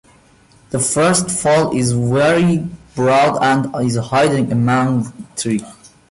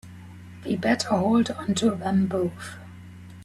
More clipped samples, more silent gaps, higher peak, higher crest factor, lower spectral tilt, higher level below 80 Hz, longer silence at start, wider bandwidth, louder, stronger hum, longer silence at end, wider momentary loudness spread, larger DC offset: neither; neither; first, -4 dBFS vs -8 dBFS; second, 12 dB vs 18 dB; about the same, -5 dB/octave vs -5.5 dB/octave; first, -48 dBFS vs -60 dBFS; first, 0.7 s vs 0.05 s; second, 11.5 kHz vs 13 kHz; first, -16 LUFS vs -24 LUFS; neither; first, 0.4 s vs 0 s; second, 8 LU vs 22 LU; neither